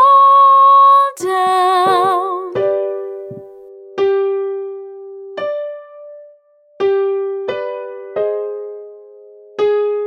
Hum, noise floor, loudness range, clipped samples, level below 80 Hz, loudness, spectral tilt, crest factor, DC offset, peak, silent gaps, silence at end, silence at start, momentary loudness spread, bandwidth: none; -49 dBFS; 10 LU; under 0.1%; -70 dBFS; -14 LUFS; -4.5 dB/octave; 12 dB; under 0.1%; -2 dBFS; none; 0 s; 0 s; 23 LU; 14 kHz